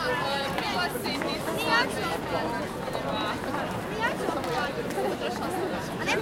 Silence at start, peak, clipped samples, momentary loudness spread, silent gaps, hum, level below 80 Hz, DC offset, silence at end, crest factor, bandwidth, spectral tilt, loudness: 0 s; -10 dBFS; under 0.1%; 6 LU; none; none; -52 dBFS; under 0.1%; 0 s; 20 dB; 17 kHz; -4 dB/octave; -29 LUFS